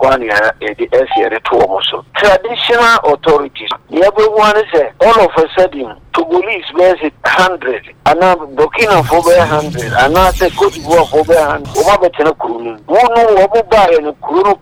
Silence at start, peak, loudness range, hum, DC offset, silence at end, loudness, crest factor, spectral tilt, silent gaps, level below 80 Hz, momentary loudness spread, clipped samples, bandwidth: 0 s; 0 dBFS; 2 LU; none; under 0.1%; 0.05 s; -11 LUFS; 10 dB; -4.5 dB/octave; none; -34 dBFS; 7 LU; under 0.1%; 17.5 kHz